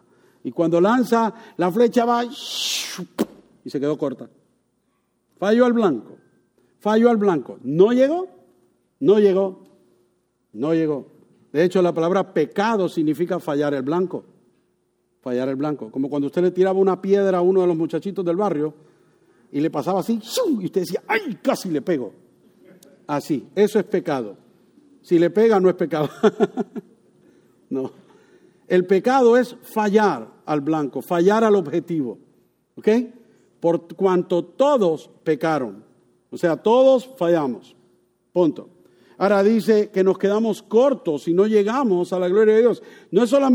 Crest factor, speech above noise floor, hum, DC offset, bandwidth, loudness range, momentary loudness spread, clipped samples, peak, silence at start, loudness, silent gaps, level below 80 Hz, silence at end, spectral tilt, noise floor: 18 dB; 49 dB; none; under 0.1%; 19.5 kHz; 5 LU; 12 LU; under 0.1%; -4 dBFS; 0.45 s; -20 LUFS; none; -72 dBFS; 0 s; -6 dB/octave; -69 dBFS